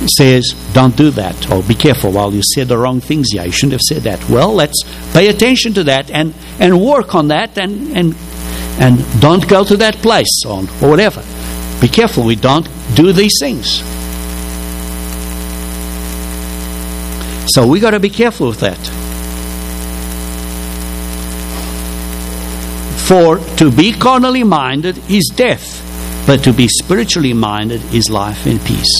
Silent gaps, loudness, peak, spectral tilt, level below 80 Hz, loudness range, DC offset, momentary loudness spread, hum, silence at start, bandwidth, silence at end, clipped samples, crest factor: none; -12 LUFS; 0 dBFS; -4.5 dB/octave; -26 dBFS; 9 LU; under 0.1%; 13 LU; none; 0 s; 16 kHz; 0 s; 0.5%; 12 dB